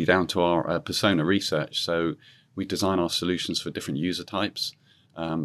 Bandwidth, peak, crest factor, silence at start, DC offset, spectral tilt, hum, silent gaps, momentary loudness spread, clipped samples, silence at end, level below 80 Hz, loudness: 13.5 kHz; -6 dBFS; 20 dB; 0 s; under 0.1%; -4.5 dB/octave; none; none; 9 LU; under 0.1%; 0 s; -64 dBFS; -26 LUFS